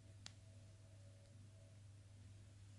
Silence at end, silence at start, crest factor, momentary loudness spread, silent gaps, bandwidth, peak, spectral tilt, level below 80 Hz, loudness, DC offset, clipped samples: 0 s; 0 s; 28 dB; 4 LU; none; 11 kHz; -34 dBFS; -4.5 dB/octave; -76 dBFS; -63 LUFS; under 0.1%; under 0.1%